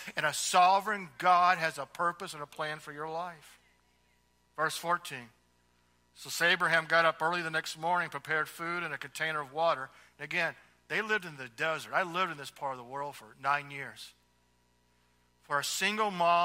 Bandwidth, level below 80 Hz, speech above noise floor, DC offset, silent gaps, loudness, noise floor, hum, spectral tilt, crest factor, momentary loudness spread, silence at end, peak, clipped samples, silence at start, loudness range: 16 kHz; -76 dBFS; 39 dB; under 0.1%; none; -31 LUFS; -71 dBFS; 60 Hz at -70 dBFS; -2.5 dB/octave; 22 dB; 16 LU; 0 s; -10 dBFS; under 0.1%; 0 s; 8 LU